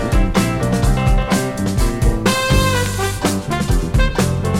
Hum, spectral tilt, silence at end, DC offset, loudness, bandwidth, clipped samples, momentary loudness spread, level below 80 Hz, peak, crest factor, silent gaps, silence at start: none; -5 dB/octave; 0 s; under 0.1%; -17 LUFS; 16.5 kHz; under 0.1%; 4 LU; -20 dBFS; -2 dBFS; 14 dB; none; 0 s